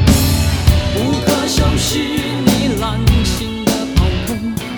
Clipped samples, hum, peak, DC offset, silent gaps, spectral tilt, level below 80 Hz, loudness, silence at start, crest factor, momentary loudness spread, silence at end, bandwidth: under 0.1%; none; 0 dBFS; under 0.1%; none; -5 dB/octave; -20 dBFS; -15 LUFS; 0 s; 14 dB; 4 LU; 0 s; over 20 kHz